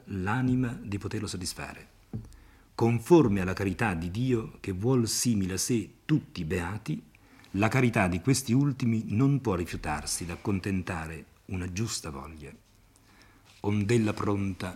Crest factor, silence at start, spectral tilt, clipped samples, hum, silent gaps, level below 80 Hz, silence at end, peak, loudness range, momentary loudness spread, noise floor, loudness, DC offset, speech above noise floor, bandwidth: 22 dB; 0.05 s; -5.5 dB/octave; under 0.1%; none; none; -54 dBFS; 0 s; -8 dBFS; 7 LU; 15 LU; -60 dBFS; -29 LUFS; under 0.1%; 31 dB; 16 kHz